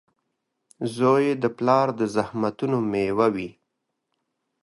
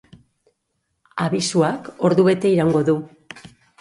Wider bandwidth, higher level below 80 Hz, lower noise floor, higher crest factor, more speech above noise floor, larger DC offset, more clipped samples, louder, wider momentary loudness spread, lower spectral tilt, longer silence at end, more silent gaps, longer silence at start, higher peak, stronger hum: about the same, 11.5 kHz vs 11.5 kHz; about the same, -62 dBFS vs -58 dBFS; first, -79 dBFS vs -73 dBFS; about the same, 20 dB vs 16 dB; about the same, 56 dB vs 55 dB; neither; neither; second, -23 LUFS vs -19 LUFS; second, 12 LU vs 23 LU; about the same, -7 dB/octave vs -6 dB/octave; first, 1.1 s vs 0.4 s; neither; second, 0.8 s vs 1.15 s; about the same, -4 dBFS vs -4 dBFS; neither